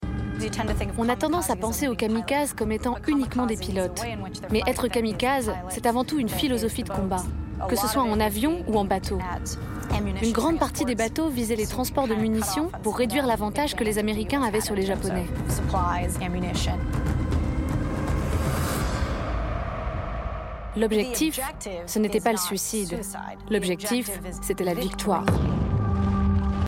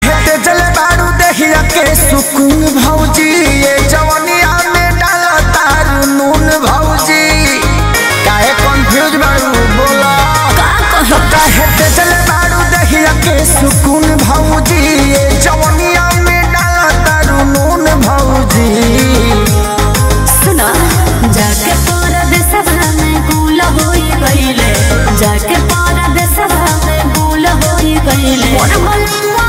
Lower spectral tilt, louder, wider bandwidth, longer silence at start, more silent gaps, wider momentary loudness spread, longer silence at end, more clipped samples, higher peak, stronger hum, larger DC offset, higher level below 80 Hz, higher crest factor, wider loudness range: about the same, -5 dB/octave vs -4 dB/octave; second, -26 LUFS vs -8 LUFS; about the same, 16.5 kHz vs 16.5 kHz; about the same, 0 s vs 0 s; neither; first, 7 LU vs 3 LU; about the same, 0 s vs 0 s; neither; second, -8 dBFS vs 0 dBFS; neither; neither; second, -34 dBFS vs -16 dBFS; first, 18 dB vs 8 dB; about the same, 2 LU vs 2 LU